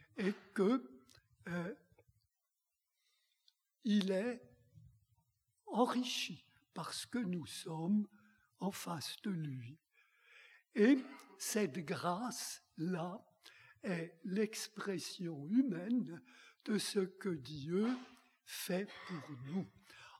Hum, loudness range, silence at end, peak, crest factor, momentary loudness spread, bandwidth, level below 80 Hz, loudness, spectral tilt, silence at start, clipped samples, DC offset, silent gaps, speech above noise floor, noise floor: none; 5 LU; 0.05 s; -20 dBFS; 22 dB; 15 LU; 16 kHz; -84 dBFS; -39 LUFS; -5 dB/octave; 0.15 s; under 0.1%; under 0.1%; none; 51 dB; -89 dBFS